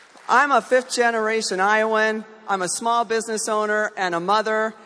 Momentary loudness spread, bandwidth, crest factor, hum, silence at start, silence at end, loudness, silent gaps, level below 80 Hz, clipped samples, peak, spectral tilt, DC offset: 6 LU; 11 kHz; 16 dB; none; 0.3 s; 0.1 s; -20 LUFS; none; -76 dBFS; under 0.1%; -4 dBFS; -2.5 dB/octave; under 0.1%